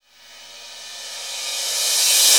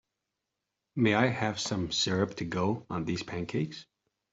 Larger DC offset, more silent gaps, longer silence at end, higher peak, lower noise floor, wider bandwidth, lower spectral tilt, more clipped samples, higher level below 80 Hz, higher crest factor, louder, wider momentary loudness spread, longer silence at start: neither; neither; second, 0 s vs 0.5 s; first, 0 dBFS vs -10 dBFS; second, -45 dBFS vs -86 dBFS; first, over 20 kHz vs 8.2 kHz; second, 4.5 dB/octave vs -5 dB/octave; neither; second, -70 dBFS vs -62 dBFS; about the same, 22 dB vs 22 dB; first, -18 LUFS vs -30 LUFS; first, 23 LU vs 8 LU; second, 0.3 s vs 0.95 s